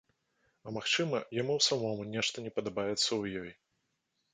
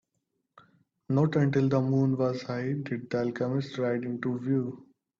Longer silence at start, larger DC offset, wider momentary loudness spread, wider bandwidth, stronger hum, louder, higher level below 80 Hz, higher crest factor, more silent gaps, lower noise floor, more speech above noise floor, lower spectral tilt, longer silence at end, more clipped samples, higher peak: second, 0.65 s vs 1.1 s; neither; first, 14 LU vs 7 LU; first, 9.4 kHz vs 7.2 kHz; neither; second, -32 LUFS vs -29 LUFS; about the same, -70 dBFS vs -68 dBFS; about the same, 20 dB vs 16 dB; neither; about the same, -81 dBFS vs -80 dBFS; second, 47 dB vs 52 dB; second, -3 dB/octave vs -8.5 dB/octave; first, 0.8 s vs 0.4 s; neither; about the same, -14 dBFS vs -12 dBFS